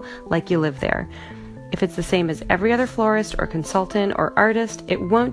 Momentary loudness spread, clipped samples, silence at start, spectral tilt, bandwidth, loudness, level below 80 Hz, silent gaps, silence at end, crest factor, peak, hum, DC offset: 9 LU; under 0.1%; 0 s; -5.5 dB/octave; 11 kHz; -21 LUFS; -40 dBFS; none; 0 s; 20 dB; 0 dBFS; none; under 0.1%